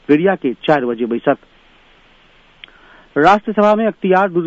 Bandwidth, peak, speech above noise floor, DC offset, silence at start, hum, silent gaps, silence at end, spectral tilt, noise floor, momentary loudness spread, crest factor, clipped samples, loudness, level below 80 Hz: 8 kHz; 0 dBFS; 35 dB; under 0.1%; 0.1 s; none; none; 0 s; -7.5 dB/octave; -49 dBFS; 7 LU; 16 dB; under 0.1%; -15 LUFS; -54 dBFS